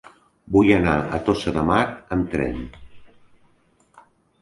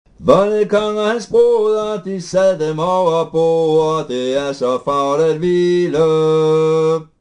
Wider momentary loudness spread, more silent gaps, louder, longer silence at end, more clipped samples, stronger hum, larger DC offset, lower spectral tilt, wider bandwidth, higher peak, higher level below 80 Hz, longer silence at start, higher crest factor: first, 10 LU vs 6 LU; neither; second, -21 LUFS vs -15 LUFS; first, 1.35 s vs 0.15 s; neither; neither; neither; about the same, -7 dB/octave vs -6 dB/octave; about the same, 11.5 kHz vs 10.5 kHz; about the same, -2 dBFS vs 0 dBFS; first, -40 dBFS vs -50 dBFS; first, 0.5 s vs 0.2 s; first, 20 dB vs 14 dB